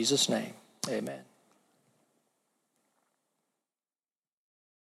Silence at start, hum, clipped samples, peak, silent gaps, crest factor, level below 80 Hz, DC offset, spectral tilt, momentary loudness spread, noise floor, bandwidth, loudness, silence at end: 0 s; none; under 0.1%; -14 dBFS; none; 24 dB; under -90 dBFS; under 0.1%; -2.5 dB/octave; 17 LU; under -90 dBFS; 16 kHz; -32 LUFS; 3.65 s